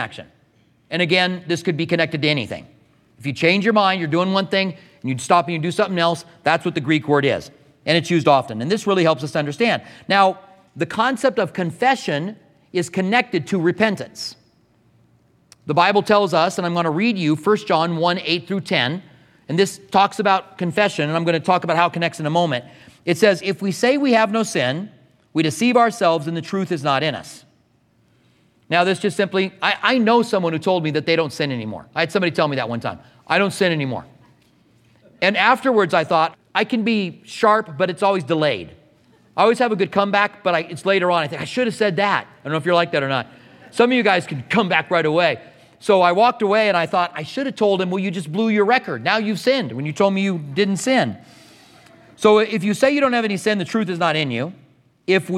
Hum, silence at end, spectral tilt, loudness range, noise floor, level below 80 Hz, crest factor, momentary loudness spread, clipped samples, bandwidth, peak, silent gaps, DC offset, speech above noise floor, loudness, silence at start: none; 0 s; -5 dB/octave; 3 LU; -60 dBFS; -66 dBFS; 18 dB; 10 LU; under 0.1%; 14.5 kHz; 0 dBFS; none; under 0.1%; 41 dB; -19 LUFS; 0 s